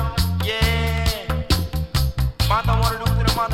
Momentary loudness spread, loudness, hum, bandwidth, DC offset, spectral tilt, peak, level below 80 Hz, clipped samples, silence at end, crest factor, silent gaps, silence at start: 4 LU; -21 LUFS; none; 17 kHz; under 0.1%; -5 dB/octave; -4 dBFS; -24 dBFS; under 0.1%; 0 s; 16 dB; none; 0 s